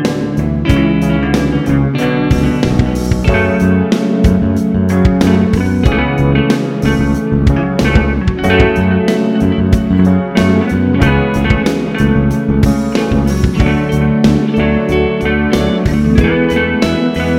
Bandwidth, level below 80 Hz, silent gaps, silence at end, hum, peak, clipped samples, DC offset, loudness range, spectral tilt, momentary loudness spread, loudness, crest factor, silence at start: 15.5 kHz; -22 dBFS; none; 0 s; none; 0 dBFS; under 0.1%; 0.5%; 1 LU; -7 dB/octave; 3 LU; -12 LUFS; 12 dB; 0 s